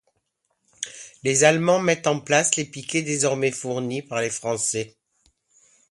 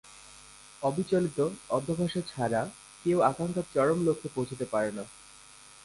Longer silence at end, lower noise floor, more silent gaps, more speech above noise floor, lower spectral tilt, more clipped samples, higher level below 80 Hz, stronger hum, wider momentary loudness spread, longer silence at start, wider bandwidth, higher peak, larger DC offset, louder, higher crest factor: first, 1.05 s vs 0.15 s; first, -74 dBFS vs -53 dBFS; neither; first, 51 dB vs 24 dB; second, -3.5 dB/octave vs -6 dB/octave; neither; about the same, -66 dBFS vs -62 dBFS; neither; second, 15 LU vs 23 LU; first, 0.8 s vs 0.05 s; about the same, 11.5 kHz vs 11.5 kHz; first, -2 dBFS vs -12 dBFS; neither; first, -22 LUFS vs -30 LUFS; about the same, 22 dB vs 20 dB